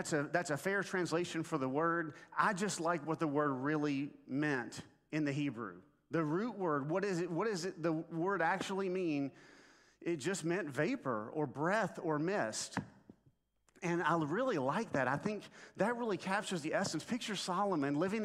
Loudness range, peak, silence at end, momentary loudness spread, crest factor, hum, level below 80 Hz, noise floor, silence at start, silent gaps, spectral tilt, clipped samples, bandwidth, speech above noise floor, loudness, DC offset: 2 LU; -16 dBFS; 0 s; 6 LU; 20 dB; none; -78 dBFS; -73 dBFS; 0 s; none; -5 dB/octave; under 0.1%; 14.5 kHz; 37 dB; -37 LUFS; under 0.1%